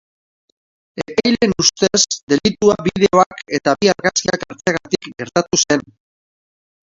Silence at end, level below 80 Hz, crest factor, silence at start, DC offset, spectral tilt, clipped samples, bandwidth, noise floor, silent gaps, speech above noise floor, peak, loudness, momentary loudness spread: 1.05 s; -50 dBFS; 18 dB; 0.95 s; under 0.1%; -3 dB/octave; under 0.1%; 7.8 kHz; under -90 dBFS; 2.23-2.27 s, 3.26-3.31 s; over 74 dB; 0 dBFS; -16 LUFS; 8 LU